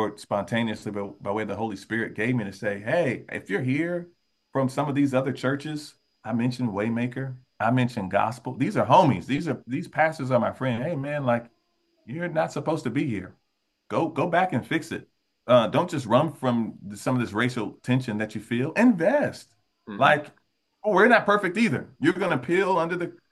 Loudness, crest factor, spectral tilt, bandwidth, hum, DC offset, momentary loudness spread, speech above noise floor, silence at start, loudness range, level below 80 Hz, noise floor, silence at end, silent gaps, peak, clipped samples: -25 LUFS; 22 dB; -6.5 dB/octave; 12.5 kHz; none; under 0.1%; 12 LU; 45 dB; 0 s; 5 LU; -66 dBFS; -70 dBFS; 0.2 s; none; -4 dBFS; under 0.1%